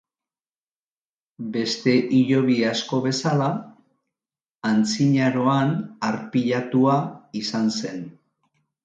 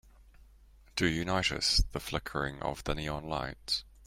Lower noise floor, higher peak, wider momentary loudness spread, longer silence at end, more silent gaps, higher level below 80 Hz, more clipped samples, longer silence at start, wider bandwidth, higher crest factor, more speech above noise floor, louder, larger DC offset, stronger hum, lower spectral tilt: first, under -90 dBFS vs -58 dBFS; first, -6 dBFS vs -14 dBFS; about the same, 11 LU vs 9 LU; first, 0.75 s vs 0 s; first, 4.51-4.59 s vs none; second, -68 dBFS vs -42 dBFS; neither; first, 1.4 s vs 0.05 s; second, 9 kHz vs 16 kHz; about the same, 18 dB vs 20 dB; first, over 69 dB vs 26 dB; first, -22 LUFS vs -32 LUFS; neither; neither; first, -6 dB/octave vs -3.5 dB/octave